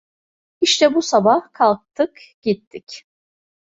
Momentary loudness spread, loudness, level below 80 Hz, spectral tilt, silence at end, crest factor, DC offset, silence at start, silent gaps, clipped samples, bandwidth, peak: 20 LU; -18 LUFS; -64 dBFS; -3.5 dB/octave; 0.6 s; 18 dB; under 0.1%; 0.6 s; 2.34-2.42 s, 2.67-2.71 s; under 0.1%; 8.2 kHz; -2 dBFS